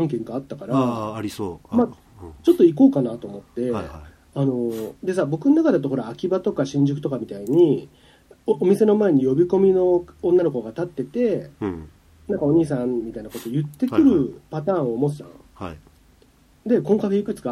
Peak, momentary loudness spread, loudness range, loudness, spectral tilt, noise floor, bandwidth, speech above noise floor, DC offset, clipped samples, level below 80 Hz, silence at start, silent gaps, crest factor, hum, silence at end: -4 dBFS; 14 LU; 4 LU; -21 LUFS; -8.5 dB/octave; -55 dBFS; 14.5 kHz; 35 dB; under 0.1%; under 0.1%; -52 dBFS; 0 s; none; 18 dB; none; 0 s